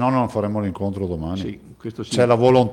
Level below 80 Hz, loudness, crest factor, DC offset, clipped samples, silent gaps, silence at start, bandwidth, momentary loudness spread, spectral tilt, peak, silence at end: -50 dBFS; -20 LUFS; 16 dB; under 0.1%; under 0.1%; none; 0 s; 12 kHz; 17 LU; -7 dB/octave; -2 dBFS; 0 s